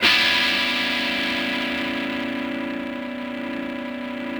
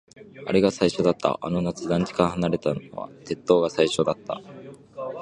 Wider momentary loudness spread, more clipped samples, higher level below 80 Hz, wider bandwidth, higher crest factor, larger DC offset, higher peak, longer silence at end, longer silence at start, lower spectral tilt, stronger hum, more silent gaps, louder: second, 13 LU vs 16 LU; neither; about the same, -56 dBFS vs -54 dBFS; first, over 20 kHz vs 11 kHz; about the same, 20 dB vs 22 dB; neither; about the same, -4 dBFS vs -2 dBFS; about the same, 0 s vs 0 s; second, 0 s vs 0.2 s; second, -2.5 dB/octave vs -6 dB/octave; neither; neither; about the same, -22 LUFS vs -24 LUFS